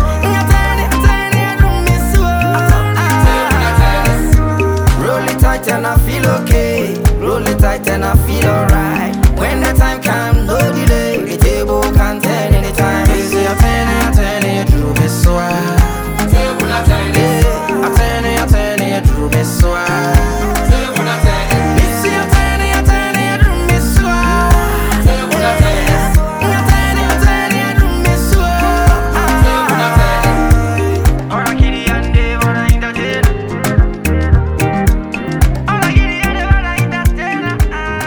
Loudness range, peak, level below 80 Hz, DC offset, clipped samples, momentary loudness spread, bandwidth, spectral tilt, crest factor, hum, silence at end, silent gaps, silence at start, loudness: 2 LU; 0 dBFS; -14 dBFS; under 0.1%; under 0.1%; 3 LU; over 20 kHz; -5.5 dB/octave; 10 dB; none; 0 s; none; 0 s; -12 LUFS